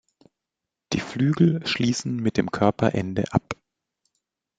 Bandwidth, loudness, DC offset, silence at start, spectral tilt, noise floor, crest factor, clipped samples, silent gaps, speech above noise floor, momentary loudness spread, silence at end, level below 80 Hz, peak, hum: 9.2 kHz; -24 LUFS; under 0.1%; 0.9 s; -6 dB/octave; -86 dBFS; 22 dB; under 0.1%; none; 64 dB; 9 LU; 1.05 s; -54 dBFS; -4 dBFS; none